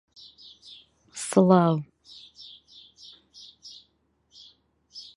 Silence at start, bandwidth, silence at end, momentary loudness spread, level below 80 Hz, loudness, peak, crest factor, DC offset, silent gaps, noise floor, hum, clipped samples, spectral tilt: 1.15 s; 11.5 kHz; 0.15 s; 28 LU; -70 dBFS; -22 LUFS; -6 dBFS; 24 dB; under 0.1%; none; -69 dBFS; none; under 0.1%; -6.5 dB/octave